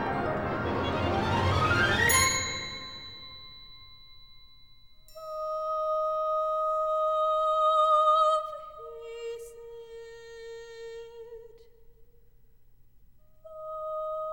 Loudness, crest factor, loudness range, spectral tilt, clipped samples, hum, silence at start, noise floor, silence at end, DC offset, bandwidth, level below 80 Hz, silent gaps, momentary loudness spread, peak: -27 LUFS; 20 dB; 21 LU; -3.5 dB/octave; under 0.1%; none; 0 s; -60 dBFS; 0 s; 0.1%; 19.5 kHz; -52 dBFS; none; 23 LU; -10 dBFS